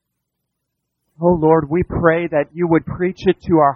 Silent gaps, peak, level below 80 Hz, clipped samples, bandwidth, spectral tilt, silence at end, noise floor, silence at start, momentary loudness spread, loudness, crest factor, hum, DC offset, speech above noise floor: none; 0 dBFS; -40 dBFS; under 0.1%; 6.6 kHz; -9.5 dB/octave; 0 s; -76 dBFS; 1.2 s; 5 LU; -17 LUFS; 16 dB; none; under 0.1%; 60 dB